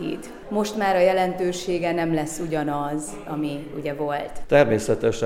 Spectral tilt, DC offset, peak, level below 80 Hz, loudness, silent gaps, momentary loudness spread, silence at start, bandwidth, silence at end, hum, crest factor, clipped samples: -5.5 dB/octave; under 0.1%; -4 dBFS; -46 dBFS; -23 LUFS; none; 12 LU; 0 s; 16 kHz; 0 s; none; 18 dB; under 0.1%